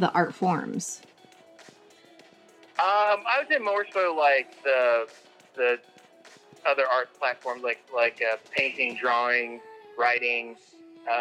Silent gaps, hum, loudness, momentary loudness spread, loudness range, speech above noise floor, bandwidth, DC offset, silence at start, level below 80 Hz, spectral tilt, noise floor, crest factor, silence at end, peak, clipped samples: none; none; -25 LUFS; 13 LU; 4 LU; 29 dB; 13.5 kHz; under 0.1%; 0 s; -88 dBFS; -4 dB/octave; -55 dBFS; 20 dB; 0 s; -8 dBFS; under 0.1%